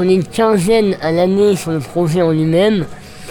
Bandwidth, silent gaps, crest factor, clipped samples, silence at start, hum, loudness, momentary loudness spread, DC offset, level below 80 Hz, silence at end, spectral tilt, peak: 19 kHz; none; 12 dB; under 0.1%; 0 s; none; -14 LUFS; 7 LU; 0.1%; -44 dBFS; 0 s; -6.5 dB/octave; -2 dBFS